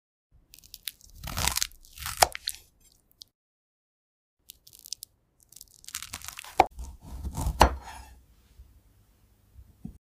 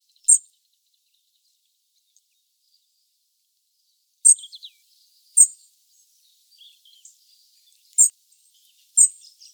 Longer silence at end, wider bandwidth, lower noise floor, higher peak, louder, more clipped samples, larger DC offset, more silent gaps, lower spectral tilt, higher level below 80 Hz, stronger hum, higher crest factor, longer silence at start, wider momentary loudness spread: second, 0.1 s vs 0.45 s; second, 16 kHz vs over 20 kHz; second, -63 dBFS vs -71 dBFS; second, -4 dBFS vs 0 dBFS; second, -29 LUFS vs -16 LUFS; neither; neither; first, 3.35-4.37 s vs none; first, -2.5 dB/octave vs 10.5 dB/octave; first, -42 dBFS vs under -90 dBFS; neither; about the same, 28 dB vs 24 dB; first, 0.85 s vs 0.3 s; first, 26 LU vs 9 LU